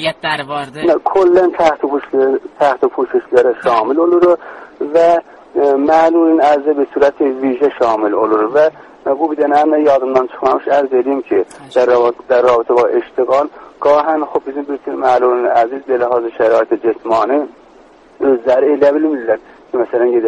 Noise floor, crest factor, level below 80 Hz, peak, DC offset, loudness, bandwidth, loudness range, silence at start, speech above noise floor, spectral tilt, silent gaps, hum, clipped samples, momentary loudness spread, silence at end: -43 dBFS; 12 dB; -56 dBFS; 0 dBFS; under 0.1%; -13 LUFS; 11 kHz; 2 LU; 0 s; 30 dB; -6 dB/octave; none; none; under 0.1%; 8 LU; 0 s